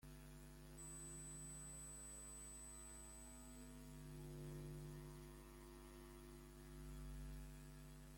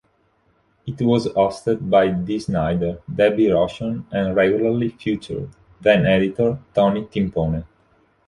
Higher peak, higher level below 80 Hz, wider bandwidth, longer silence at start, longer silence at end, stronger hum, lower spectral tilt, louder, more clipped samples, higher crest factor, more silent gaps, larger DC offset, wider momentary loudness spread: second, -44 dBFS vs -2 dBFS; second, -62 dBFS vs -44 dBFS; first, 16.5 kHz vs 11 kHz; second, 0 s vs 0.85 s; second, 0 s vs 0.6 s; neither; second, -4.5 dB/octave vs -7.5 dB/octave; second, -57 LUFS vs -20 LUFS; neither; second, 12 dB vs 18 dB; neither; neither; second, 7 LU vs 10 LU